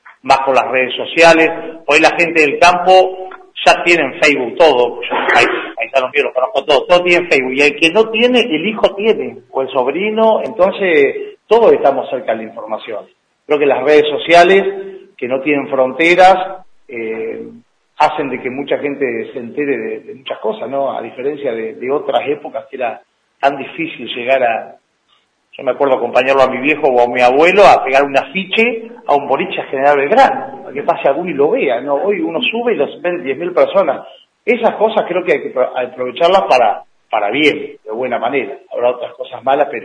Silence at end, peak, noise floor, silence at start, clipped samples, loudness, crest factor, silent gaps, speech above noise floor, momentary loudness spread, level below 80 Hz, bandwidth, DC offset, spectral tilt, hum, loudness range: 0 s; 0 dBFS; -58 dBFS; 0.05 s; 0.2%; -13 LUFS; 14 dB; none; 45 dB; 13 LU; -52 dBFS; 11 kHz; under 0.1%; -4 dB/octave; none; 8 LU